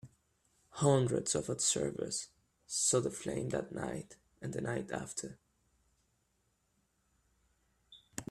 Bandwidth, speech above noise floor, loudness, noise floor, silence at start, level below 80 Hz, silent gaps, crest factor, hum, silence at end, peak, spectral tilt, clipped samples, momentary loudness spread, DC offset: 14.5 kHz; 43 dB; -35 LUFS; -78 dBFS; 0.05 s; -68 dBFS; none; 22 dB; none; 0.05 s; -16 dBFS; -4 dB/octave; under 0.1%; 17 LU; under 0.1%